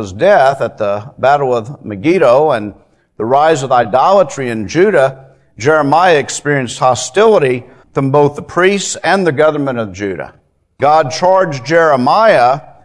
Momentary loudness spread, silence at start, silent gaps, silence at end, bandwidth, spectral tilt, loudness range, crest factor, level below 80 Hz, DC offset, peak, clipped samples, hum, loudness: 10 LU; 0 s; none; 0.2 s; 11 kHz; -5 dB/octave; 2 LU; 12 dB; -52 dBFS; under 0.1%; 0 dBFS; 0.2%; none; -12 LUFS